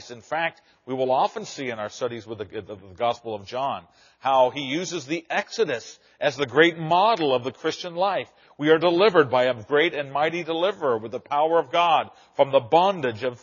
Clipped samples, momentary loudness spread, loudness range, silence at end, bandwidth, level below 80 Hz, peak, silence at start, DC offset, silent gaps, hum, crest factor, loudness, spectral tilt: under 0.1%; 13 LU; 7 LU; 0.05 s; 7.2 kHz; -72 dBFS; -2 dBFS; 0 s; under 0.1%; none; none; 20 dB; -23 LUFS; -2.5 dB/octave